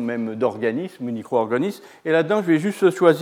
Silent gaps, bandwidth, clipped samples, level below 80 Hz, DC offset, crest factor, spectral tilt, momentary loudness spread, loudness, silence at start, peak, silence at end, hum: none; 15.5 kHz; under 0.1%; -82 dBFS; under 0.1%; 18 dB; -6.5 dB/octave; 11 LU; -21 LUFS; 0 s; -2 dBFS; 0 s; none